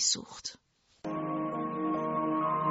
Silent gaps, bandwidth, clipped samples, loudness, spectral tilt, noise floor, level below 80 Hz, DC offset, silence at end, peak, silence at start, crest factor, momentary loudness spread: none; 8 kHz; under 0.1%; -33 LUFS; -3.5 dB/octave; -65 dBFS; -70 dBFS; under 0.1%; 0 s; -14 dBFS; 0 s; 18 dB; 12 LU